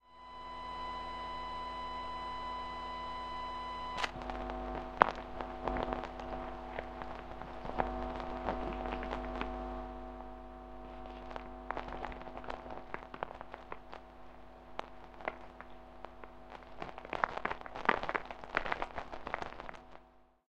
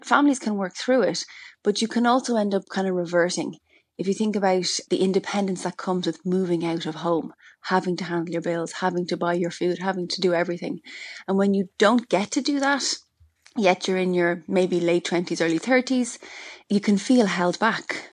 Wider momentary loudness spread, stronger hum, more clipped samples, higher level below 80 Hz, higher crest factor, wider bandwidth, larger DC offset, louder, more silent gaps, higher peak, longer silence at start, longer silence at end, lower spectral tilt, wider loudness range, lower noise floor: first, 15 LU vs 9 LU; neither; neither; first, -52 dBFS vs -72 dBFS; first, 38 dB vs 22 dB; about the same, 10.5 kHz vs 11 kHz; neither; second, -40 LUFS vs -24 LUFS; neither; about the same, -2 dBFS vs -2 dBFS; about the same, 0.05 s vs 0.05 s; first, 0.2 s vs 0.05 s; about the same, -5.5 dB/octave vs -4.5 dB/octave; first, 10 LU vs 3 LU; first, -63 dBFS vs -57 dBFS